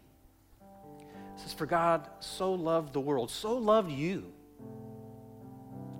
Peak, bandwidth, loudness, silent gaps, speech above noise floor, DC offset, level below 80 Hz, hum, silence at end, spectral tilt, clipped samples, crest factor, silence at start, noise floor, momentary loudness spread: -14 dBFS; 16.5 kHz; -32 LUFS; none; 31 dB; under 0.1%; -64 dBFS; none; 0 s; -5.5 dB/octave; under 0.1%; 20 dB; 0.6 s; -61 dBFS; 23 LU